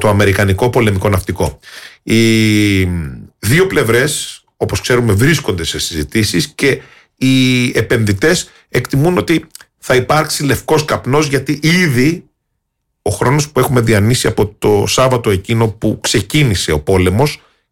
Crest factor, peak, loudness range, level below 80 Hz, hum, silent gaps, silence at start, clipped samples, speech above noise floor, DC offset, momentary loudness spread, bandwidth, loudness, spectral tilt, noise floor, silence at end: 10 dB; -2 dBFS; 1 LU; -36 dBFS; none; none; 0 s; under 0.1%; 57 dB; under 0.1%; 8 LU; 17 kHz; -13 LUFS; -5 dB/octave; -70 dBFS; 0.35 s